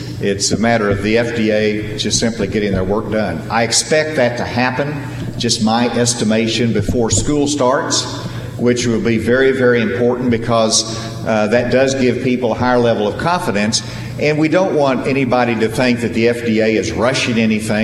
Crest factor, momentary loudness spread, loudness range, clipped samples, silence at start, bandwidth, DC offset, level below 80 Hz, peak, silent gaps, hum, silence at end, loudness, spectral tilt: 14 dB; 5 LU; 1 LU; under 0.1%; 0 s; 14 kHz; under 0.1%; -38 dBFS; 0 dBFS; none; none; 0 s; -15 LUFS; -4.5 dB/octave